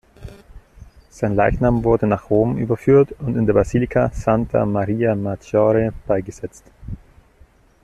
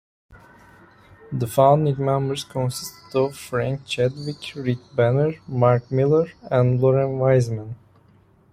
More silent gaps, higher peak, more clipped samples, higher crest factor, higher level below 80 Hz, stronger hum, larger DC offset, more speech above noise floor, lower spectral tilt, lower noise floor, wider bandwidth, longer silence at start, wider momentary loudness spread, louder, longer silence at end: neither; about the same, -2 dBFS vs -2 dBFS; neither; about the same, 16 dB vs 20 dB; first, -36 dBFS vs -54 dBFS; neither; neither; about the same, 33 dB vs 35 dB; first, -9 dB/octave vs -7 dB/octave; second, -51 dBFS vs -55 dBFS; second, 11.5 kHz vs 15.5 kHz; about the same, 0.2 s vs 0.3 s; first, 17 LU vs 11 LU; first, -18 LUFS vs -21 LUFS; about the same, 0.85 s vs 0.8 s